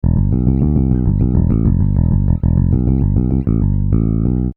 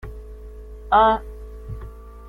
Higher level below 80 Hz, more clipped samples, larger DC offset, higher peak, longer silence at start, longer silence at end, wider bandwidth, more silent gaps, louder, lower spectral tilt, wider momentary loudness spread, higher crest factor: first, -18 dBFS vs -36 dBFS; neither; neither; first, 0 dBFS vs -4 dBFS; about the same, 0.05 s vs 0.05 s; about the same, 0.05 s vs 0 s; second, 2.5 kHz vs 4.9 kHz; neither; first, -15 LUFS vs -18 LUFS; first, -15 dB/octave vs -7 dB/octave; second, 2 LU vs 25 LU; second, 14 dB vs 20 dB